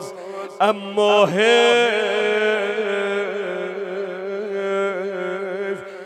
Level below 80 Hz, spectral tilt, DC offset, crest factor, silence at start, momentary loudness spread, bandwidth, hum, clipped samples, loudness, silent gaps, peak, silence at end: -78 dBFS; -3.5 dB/octave; under 0.1%; 18 dB; 0 s; 13 LU; 12.5 kHz; none; under 0.1%; -20 LUFS; none; -2 dBFS; 0 s